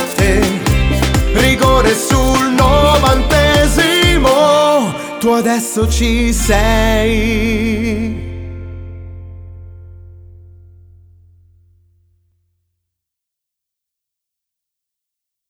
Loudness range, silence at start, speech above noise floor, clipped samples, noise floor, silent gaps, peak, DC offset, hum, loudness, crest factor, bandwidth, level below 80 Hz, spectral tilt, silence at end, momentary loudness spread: 13 LU; 0 s; 68 dB; under 0.1%; -81 dBFS; none; 0 dBFS; under 0.1%; 60 Hz at -45 dBFS; -12 LUFS; 14 dB; over 20 kHz; -22 dBFS; -4.5 dB/octave; 5.45 s; 18 LU